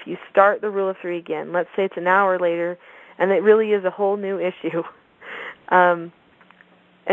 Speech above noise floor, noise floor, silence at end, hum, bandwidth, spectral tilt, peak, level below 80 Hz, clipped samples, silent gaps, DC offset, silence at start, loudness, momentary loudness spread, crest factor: 34 dB; -54 dBFS; 0 s; none; 4 kHz; -8 dB/octave; 0 dBFS; -76 dBFS; under 0.1%; none; under 0.1%; 0 s; -20 LUFS; 17 LU; 20 dB